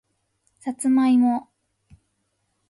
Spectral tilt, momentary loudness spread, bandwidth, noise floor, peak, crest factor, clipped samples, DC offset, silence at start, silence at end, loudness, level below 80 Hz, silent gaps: -4.5 dB/octave; 16 LU; 11.5 kHz; -73 dBFS; -12 dBFS; 12 dB; under 0.1%; under 0.1%; 0.65 s; 1.3 s; -20 LUFS; -68 dBFS; none